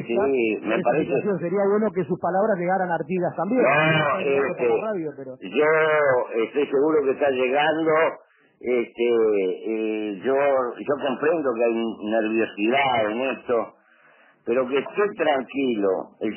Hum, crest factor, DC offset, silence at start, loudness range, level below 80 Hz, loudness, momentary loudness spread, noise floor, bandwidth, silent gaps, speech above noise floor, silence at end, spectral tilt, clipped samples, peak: none; 14 dB; under 0.1%; 0 s; 3 LU; -68 dBFS; -22 LUFS; 7 LU; -56 dBFS; 3.2 kHz; none; 34 dB; 0 s; -9.5 dB/octave; under 0.1%; -8 dBFS